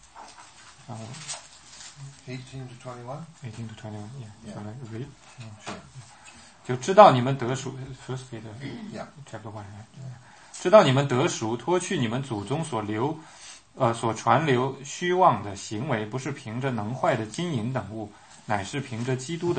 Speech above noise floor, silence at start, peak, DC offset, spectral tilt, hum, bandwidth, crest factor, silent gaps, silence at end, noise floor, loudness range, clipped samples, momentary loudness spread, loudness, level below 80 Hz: 24 dB; 0.15 s; -2 dBFS; under 0.1%; -5.5 dB/octave; none; 8.8 kHz; 26 dB; none; 0 s; -50 dBFS; 16 LU; under 0.1%; 22 LU; -25 LUFS; -64 dBFS